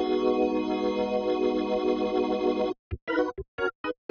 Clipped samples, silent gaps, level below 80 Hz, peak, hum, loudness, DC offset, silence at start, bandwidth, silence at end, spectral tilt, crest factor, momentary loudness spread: under 0.1%; 2.79-2.91 s, 3.02-3.07 s, 3.48-3.58 s, 3.75-3.84 s; -52 dBFS; -12 dBFS; none; -28 LUFS; under 0.1%; 0 s; 6.6 kHz; 0.15 s; -4.5 dB/octave; 14 dB; 6 LU